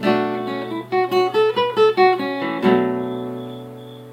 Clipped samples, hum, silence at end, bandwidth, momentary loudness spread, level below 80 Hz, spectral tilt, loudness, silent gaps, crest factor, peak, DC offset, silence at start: under 0.1%; none; 0 s; 16 kHz; 16 LU; -66 dBFS; -6.5 dB/octave; -19 LUFS; none; 16 dB; -2 dBFS; under 0.1%; 0 s